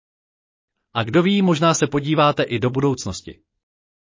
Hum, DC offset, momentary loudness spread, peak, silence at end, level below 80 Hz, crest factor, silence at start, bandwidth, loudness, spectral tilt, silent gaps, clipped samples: none; under 0.1%; 11 LU; -4 dBFS; 0.85 s; -52 dBFS; 18 dB; 0.95 s; 7.6 kHz; -19 LUFS; -5.5 dB/octave; none; under 0.1%